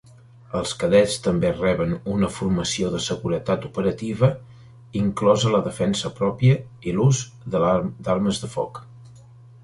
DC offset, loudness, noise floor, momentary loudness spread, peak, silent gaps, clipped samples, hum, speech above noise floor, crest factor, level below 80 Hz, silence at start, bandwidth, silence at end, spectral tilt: under 0.1%; -22 LUFS; -46 dBFS; 9 LU; -4 dBFS; none; under 0.1%; none; 25 dB; 18 dB; -46 dBFS; 0.5 s; 11.5 kHz; 0.45 s; -6 dB/octave